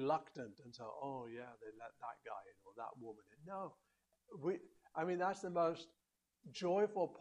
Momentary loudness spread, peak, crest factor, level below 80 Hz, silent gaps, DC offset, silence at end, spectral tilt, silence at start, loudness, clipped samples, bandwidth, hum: 17 LU; -26 dBFS; 18 dB; -86 dBFS; none; under 0.1%; 0 s; -6 dB/octave; 0 s; -44 LUFS; under 0.1%; 11 kHz; none